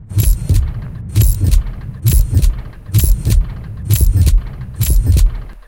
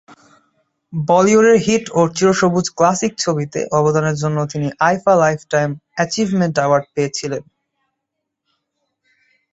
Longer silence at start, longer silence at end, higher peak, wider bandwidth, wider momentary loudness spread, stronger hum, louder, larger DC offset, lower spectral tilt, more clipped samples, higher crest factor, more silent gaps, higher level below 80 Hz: second, 0 s vs 0.9 s; second, 0.05 s vs 2.1 s; about the same, 0 dBFS vs -2 dBFS; first, 17.5 kHz vs 8.2 kHz; about the same, 12 LU vs 10 LU; neither; about the same, -15 LUFS vs -16 LUFS; first, 0.3% vs under 0.1%; about the same, -5.5 dB/octave vs -5 dB/octave; neither; about the same, 12 dB vs 16 dB; neither; first, -14 dBFS vs -56 dBFS